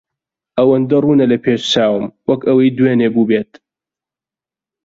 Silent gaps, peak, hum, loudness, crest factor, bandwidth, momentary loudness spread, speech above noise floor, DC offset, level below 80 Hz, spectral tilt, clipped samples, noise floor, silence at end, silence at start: none; 0 dBFS; none; -14 LUFS; 14 dB; 7.8 kHz; 7 LU; 76 dB; under 0.1%; -56 dBFS; -6.5 dB/octave; under 0.1%; -89 dBFS; 1.4 s; 0.55 s